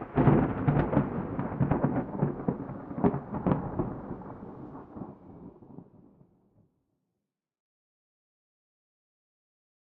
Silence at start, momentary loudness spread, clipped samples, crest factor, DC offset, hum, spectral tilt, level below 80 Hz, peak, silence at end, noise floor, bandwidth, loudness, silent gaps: 0 s; 23 LU; under 0.1%; 22 dB; under 0.1%; none; -9.5 dB/octave; -50 dBFS; -10 dBFS; 4.15 s; -86 dBFS; 3.8 kHz; -29 LUFS; none